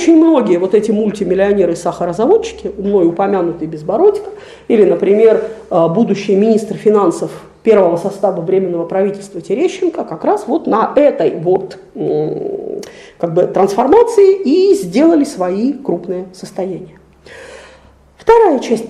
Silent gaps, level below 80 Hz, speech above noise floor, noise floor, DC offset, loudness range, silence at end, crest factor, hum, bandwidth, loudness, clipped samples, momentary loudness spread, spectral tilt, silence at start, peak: none; -48 dBFS; 31 dB; -44 dBFS; under 0.1%; 4 LU; 0 s; 12 dB; none; 12 kHz; -13 LUFS; under 0.1%; 13 LU; -6.5 dB/octave; 0 s; 0 dBFS